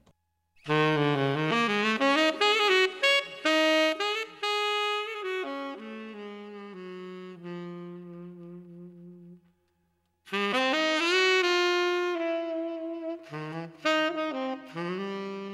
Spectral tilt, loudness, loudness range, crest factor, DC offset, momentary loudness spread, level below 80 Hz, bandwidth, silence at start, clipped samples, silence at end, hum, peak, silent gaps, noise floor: -4 dB/octave; -26 LUFS; 18 LU; 20 dB; under 0.1%; 20 LU; -80 dBFS; 15 kHz; 0.65 s; under 0.1%; 0 s; none; -10 dBFS; none; -74 dBFS